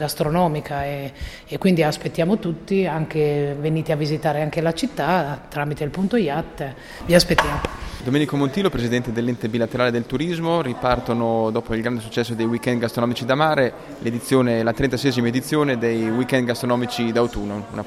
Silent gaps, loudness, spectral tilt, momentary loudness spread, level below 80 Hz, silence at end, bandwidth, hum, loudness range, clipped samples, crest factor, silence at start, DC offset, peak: none; -21 LUFS; -6 dB/octave; 8 LU; -42 dBFS; 0 s; 15.5 kHz; none; 2 LU; under 0.1%; 20 dB; 0 s; under 0.1%; 0 dBFS